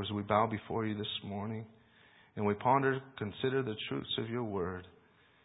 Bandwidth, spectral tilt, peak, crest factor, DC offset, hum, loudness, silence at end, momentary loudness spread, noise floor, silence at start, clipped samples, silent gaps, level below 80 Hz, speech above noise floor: 3.9 kHz; -3.5 dB/octave; -14 dBFS; 22 dB; under 0.1%; none; -35 LUFS; 0.55 s; 13 LU; -65 dBFS; 0 s; under 0.1%; none; -62 dBFS; 31 dB